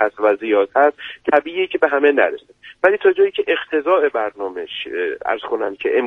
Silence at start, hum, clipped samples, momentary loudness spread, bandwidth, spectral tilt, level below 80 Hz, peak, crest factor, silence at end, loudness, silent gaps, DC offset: 0 s; none; under 0.1%; 10 LU; 4 kHz; -5.5 dB/octave; -62 dBFS; 0 dBFS; 18 dB; 0 s; -18 LUFS; none; under 0.1%